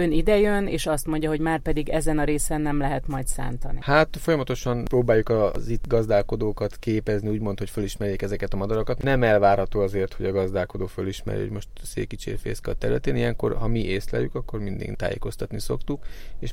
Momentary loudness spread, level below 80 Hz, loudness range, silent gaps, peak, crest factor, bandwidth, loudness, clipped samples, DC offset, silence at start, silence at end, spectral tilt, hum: 11 LU; -32 dBFS; 5 LU; none; -4 dBFS; 18 dB; 16 kHz; -25 LUFS; under 0.1%; under 0.1%; 0 s; 0 s; -6 dB/octave; none